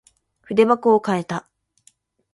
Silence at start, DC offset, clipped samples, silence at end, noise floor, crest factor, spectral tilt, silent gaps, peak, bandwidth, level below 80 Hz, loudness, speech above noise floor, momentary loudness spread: 0.5 s; under 0.1%; under 0.1%; 0.95 s; -59 dBFS; 20 dB; -6.5 dB/octave; none; -2 dBFS; 11.5 kHz; -66 dBFS; -19 LUFS; 41 dB; 13 LU